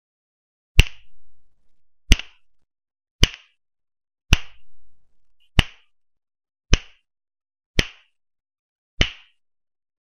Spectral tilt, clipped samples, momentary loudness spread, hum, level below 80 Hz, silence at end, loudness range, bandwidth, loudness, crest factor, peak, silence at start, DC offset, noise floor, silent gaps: -3.5 dB/octave; under 0.1%; 12 LU; none; -28 dBFS; 0.85 s; 5 LU; 13 kHz; -23 LUFS; 24 dB; 0 dBFS; 0.75 s; under 0.1%; -56 dBFS; 3.11-3.19 s, 7.66-7.74 s, 8.59-8.97 s